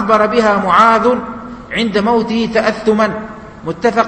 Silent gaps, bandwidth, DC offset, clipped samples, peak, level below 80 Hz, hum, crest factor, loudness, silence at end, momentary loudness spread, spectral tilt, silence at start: none; 8.8 kHz; under 0.1%; under 0.1%; 0 dBFS; -44 dBFS; none; 14 dB; -13 LUFS; 0 s; 17 LU; -5.5 dB/octave; 0 s